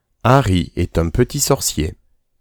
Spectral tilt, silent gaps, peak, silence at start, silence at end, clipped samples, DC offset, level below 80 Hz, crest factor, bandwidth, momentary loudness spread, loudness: -5 dB/octave; none; 0 dBFS; 0.25 s; 0.5 s; under 0.1%; under 0.1%; -30 dBFS; 16 dB; over 20 kHz; 7 LU; -17 LUFS